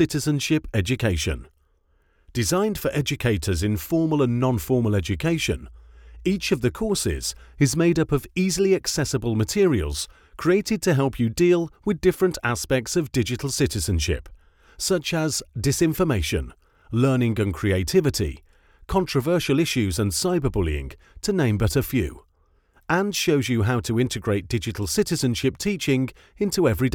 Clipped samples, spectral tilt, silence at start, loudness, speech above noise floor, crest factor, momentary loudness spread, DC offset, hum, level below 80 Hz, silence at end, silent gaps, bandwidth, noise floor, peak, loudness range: under 0.1%; -5 dB/octave; 0 s; -23 LUFS; 41 dB; 18 dB; 7 LU; under 0.1%; none; -40 dBFS; 0 s; none; 19 kHz; -63 dBFS; -6 dBFS; 2 LU